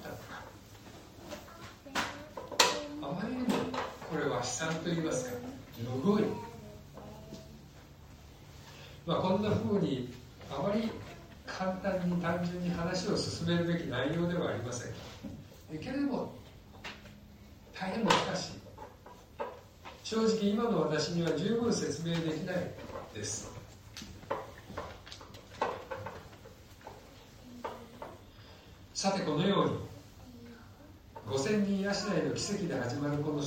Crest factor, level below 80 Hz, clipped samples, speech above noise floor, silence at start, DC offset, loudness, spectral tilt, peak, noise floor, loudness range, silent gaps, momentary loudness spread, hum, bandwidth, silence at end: 28 dB; -60 dBFS; under 0.1%; 21 dB; 0 s; under 0.1%; -34 LUFS; -5 dB/octave; -6 dBFS; -54 dBFS; 9 LU; none; 22 LU; none; 16 kHz; 0 s